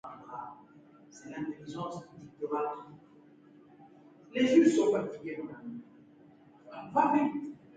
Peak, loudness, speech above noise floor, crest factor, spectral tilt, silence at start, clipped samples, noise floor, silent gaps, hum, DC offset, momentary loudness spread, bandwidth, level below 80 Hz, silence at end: -12 dBFS; -31 LUFS; 28 dB; 22 dB; -5.5 dB/octave; 0.05 s; under 0.1%; -58 dBFS; none; none; under 0.1%; 23 LU; 9.2 kHz; -76 dBFS; 0.2 s